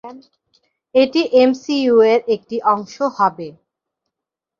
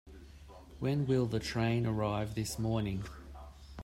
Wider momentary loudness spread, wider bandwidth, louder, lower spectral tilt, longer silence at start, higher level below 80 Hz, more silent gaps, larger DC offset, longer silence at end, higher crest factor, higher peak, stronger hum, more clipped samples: second, 9 LU vs 23 LU; second, 7.2 kHz vs 16 kHz; first, -16 LUFS vs -34 LUFS; second, -5 dB/octave vs -6.5 dB/octave; about the same, 0.05 s vs 0.05 s; second, -64 dBFS vs -52 dBFS; neither; neither; first, 1.1 s vs 0 s; about the same, 16 dB vs 16 dB; first, -2 dBFS vs -20 dBFS; neither; neither